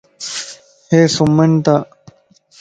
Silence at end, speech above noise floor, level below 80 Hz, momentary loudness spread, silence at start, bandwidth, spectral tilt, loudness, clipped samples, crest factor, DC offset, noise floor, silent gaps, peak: 0.75 s; 38 dB; -52 dBFS; 15 LU; 0.2 s; 9.2 kHz; -6 dB/octave; -14 LUFS; under 0.1%; 16 dB; under 0.1%; -50 dBFS; none; 0 dBFS